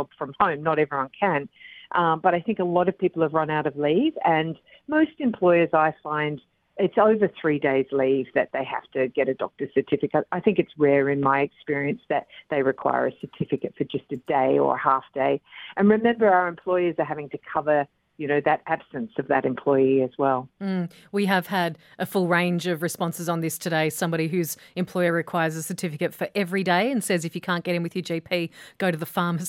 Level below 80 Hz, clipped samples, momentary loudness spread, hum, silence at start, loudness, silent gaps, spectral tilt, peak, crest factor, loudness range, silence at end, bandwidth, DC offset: -66 dBFS; under 0.1%; 9 LU; none; 0 s; -24 LUFS; none; -6 dB/octave; -4 dBFS; 18 dB; 3 LU; 0 s; 16.5 kHz; under 0.1%